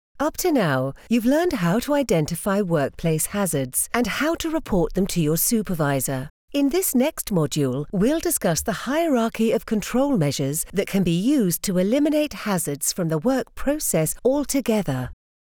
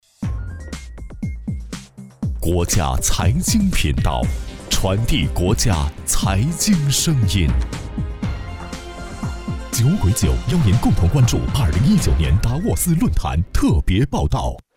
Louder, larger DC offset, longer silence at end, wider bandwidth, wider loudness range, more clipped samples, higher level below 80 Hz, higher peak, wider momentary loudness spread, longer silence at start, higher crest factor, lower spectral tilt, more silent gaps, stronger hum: second, -22 LUFS vs -19 LUFS; neither; first, 0.35 s vs 0.15 s; about the same, over 20 kHz vs 19 kHz; second, 1 LU vs 4 LU; neither; second, -44 dBFS vs -24 dBFS; about the same, -6 dBFS vs -6 dBFS; second, 4 LU vs 14 LU; about the same, 0.15 s vs 0.2 s; about the same, 16 dB vs 12 dB; about the same, -5 dB/octave vs -5 dB/octave; first, 6.30-6.48 s vs none; neither